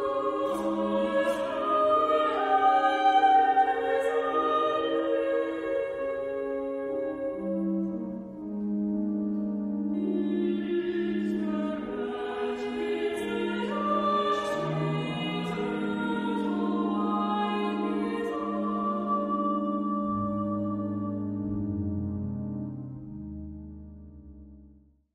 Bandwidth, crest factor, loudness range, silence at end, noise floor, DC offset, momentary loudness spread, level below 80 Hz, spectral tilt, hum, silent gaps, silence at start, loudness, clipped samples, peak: 12 kHz; 16 dB; 8 LU; 0.45 s; -57 dBFS; under 0.1%; 10 LU; -56 dBFS; -7 dB/octave; none; none; 0 s; -28 LUFS; under 0.1%; -12 dBFS